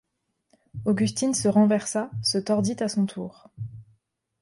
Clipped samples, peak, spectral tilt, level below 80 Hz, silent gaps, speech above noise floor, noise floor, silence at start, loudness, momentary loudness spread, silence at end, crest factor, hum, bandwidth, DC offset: under 0.1%; -10 dBFS; -5 dB/octave; -62 dBFS; none; 52 dB; -76 dBFS; 0.75 s; -24 LUFS; 19 LU; 0.6 s; 16 dB; none; 11.5 kHz; under 0.1%